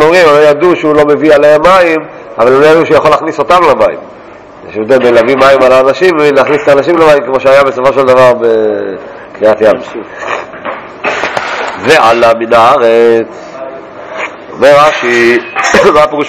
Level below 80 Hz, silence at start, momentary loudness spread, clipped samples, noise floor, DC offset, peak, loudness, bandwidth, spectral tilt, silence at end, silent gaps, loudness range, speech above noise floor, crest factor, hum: -42 dBFS; 0 s; 16 LU; 10%; -29 dBFS; under 0.1%; 0 dBFS; -6 LUFS; 16 kHz; -4.5 dB/octave; 0 s; none; 4 LU; 23 dB; 6 dB; none